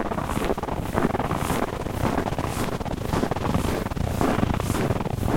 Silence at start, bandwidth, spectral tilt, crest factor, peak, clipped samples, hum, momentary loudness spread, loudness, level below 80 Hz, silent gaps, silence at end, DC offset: 0 s; 16.5 kHz; -6 dB/octave; 22 dB; -4 dBFS; under 0.1%; none; 4 LU; -26 LUFS; -36 dBFS; none; 0 s; under 0.1%